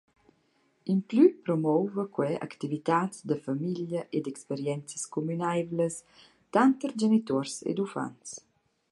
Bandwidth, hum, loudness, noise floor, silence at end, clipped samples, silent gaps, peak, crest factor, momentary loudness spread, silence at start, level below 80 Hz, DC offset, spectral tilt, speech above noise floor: 11.5 kHz; none; -29 LUFS; -70 dBFS; 0.5 s; under 0.1%; none; -10 dBFS; 20 dB; 11 LU; 0.85 s; -76 dBFS; under 0.1%; -6 dB/octave; 41 dB